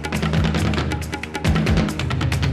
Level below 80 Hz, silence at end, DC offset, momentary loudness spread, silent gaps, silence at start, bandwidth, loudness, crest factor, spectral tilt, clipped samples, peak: -30 dBFS; 0 s; under 0.1%; 6 LU; none; 0 s; 14.5 kHz; -21 LUFS; 12 dB; -6 dB/octave; under 0.1%; -8 dBFS